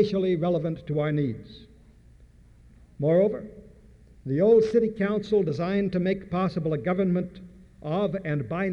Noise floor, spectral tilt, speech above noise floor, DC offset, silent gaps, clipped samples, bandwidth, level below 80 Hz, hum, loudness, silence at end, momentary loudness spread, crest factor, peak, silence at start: -53 dBFS; -9 dB/octave; 28 dB; under 0.1%; none; under 0.1%; 7 kHz; -54 dBFS; none; -25 LUFS; 0 s; 11 LU; 16 dB; -10 dBFS; 0 s